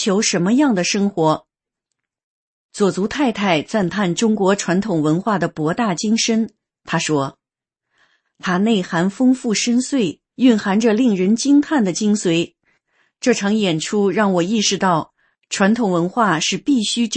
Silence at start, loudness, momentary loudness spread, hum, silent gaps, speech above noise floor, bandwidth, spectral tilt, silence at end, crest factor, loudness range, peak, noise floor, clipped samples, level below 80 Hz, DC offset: 0 s; -18 LUFS; 6 LU; none; 2.24-2.69 s; 68 dB; 8.8 kHz; -4.5 dB/octave; 0 s; 16 dB; 4 LU; -2 dBFS; -85 dBFS; under 0.1%; -58 dBFS; under 0.1%